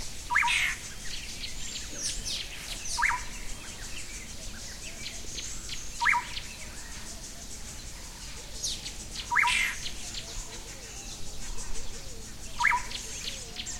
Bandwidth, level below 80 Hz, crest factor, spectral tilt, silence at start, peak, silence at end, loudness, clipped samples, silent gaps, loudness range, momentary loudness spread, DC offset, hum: 16.5 kHz; -44 dBFS; 22 dB; -0.5 dB/octave; 0 s; -12 dBFS; 0 s; -32 LUFS; under 0.1%; none; 3 LU; 15 LU; under 0.1%; none